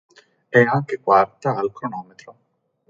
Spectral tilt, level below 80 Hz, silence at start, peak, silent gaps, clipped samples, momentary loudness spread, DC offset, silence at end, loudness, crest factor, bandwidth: -7.5 dB/octave; -66 dBFS; 0.5 s; -2 dBFS; none; under 0.1%; 14 LU; under 0.1%; 0.6 s; -19 LUFS; 20 dB; 7.6 kHz